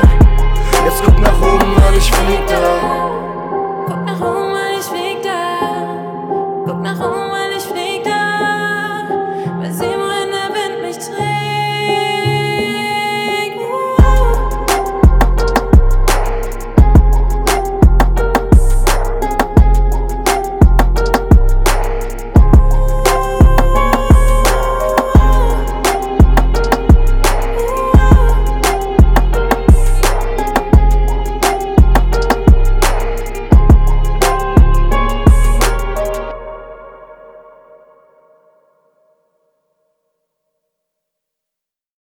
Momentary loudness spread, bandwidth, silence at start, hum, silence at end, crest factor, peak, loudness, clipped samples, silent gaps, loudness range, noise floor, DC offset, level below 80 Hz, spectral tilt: 9 LU; 17 kHz; 0 s; none; 4.65 s; 12 dB; 0 dBFS; -14 LUFS; under 0.1%; none; 6 LU; -83 dBFS; under 0.1%; -14 dBFS; -5.5 dB/octave